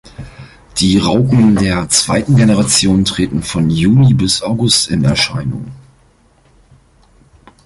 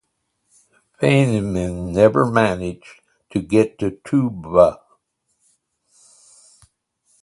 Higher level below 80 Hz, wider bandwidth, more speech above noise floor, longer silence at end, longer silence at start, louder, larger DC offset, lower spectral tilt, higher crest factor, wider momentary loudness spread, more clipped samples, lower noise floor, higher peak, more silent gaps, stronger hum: first, -36 dBFS vs -46 dBFS; about the same, 11.5 kHz vs 11.5 kHz; second, 39 dB vs 54 dB; second, 1.9 s vs 2.45 s; second, 0.2 s vs 1 s; first, -12 LUFS vs -18 LUFS; neither; second, -4.5 dB/octave vs -7 dB/octave; second, 14 dB vs 20 dB; about the same, 12 LU vs 12 LU; neither; second, -50 dBFS vs -72 dBFS; about the same, 0 dBFS vs 0 dBFS; neither; neither